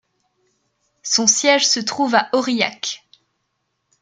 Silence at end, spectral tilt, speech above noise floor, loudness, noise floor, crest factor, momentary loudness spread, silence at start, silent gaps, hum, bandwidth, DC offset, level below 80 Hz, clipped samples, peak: 1.05 s; -1 dB/octave; 55 dB; -17 LUFS; -73 dBFS; 20 dB; 13 LU; 1.05 s; none; none; 11 kHz; under 0.1%; -72 dBFS; under 0.1%; 0 dBFS